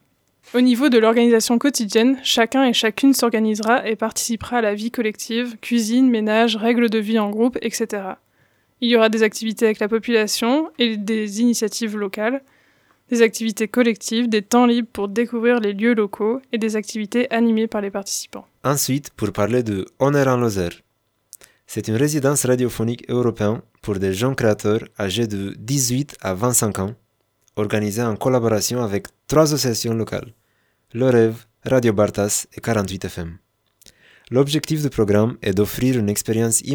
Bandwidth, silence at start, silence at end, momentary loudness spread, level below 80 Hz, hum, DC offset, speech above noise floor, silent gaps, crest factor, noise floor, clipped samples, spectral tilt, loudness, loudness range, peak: over 20 kHz; 0.55 s; 0 s; 9 LU; -54 dBFS; none; under 0.1%; 46 dB; none; 18 dB; -65 dBFS; under 0.1%; -4.5 dB/octave; -19 LUFS; 4 LU; -2 dBFS